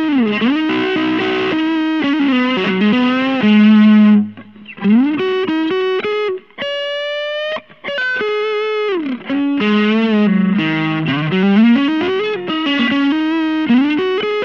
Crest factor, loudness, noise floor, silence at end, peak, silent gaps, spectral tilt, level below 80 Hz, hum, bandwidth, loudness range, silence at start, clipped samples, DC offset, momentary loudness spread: 14 dB; -15 LUFS; -35 dBFS; 0 s; -2 dBFS; none; -7.5 dB/octave; -66 dBFS; none; 6.4 kHz; 6 LU; 0 s; under 0.1%; 0.2%; 9 LU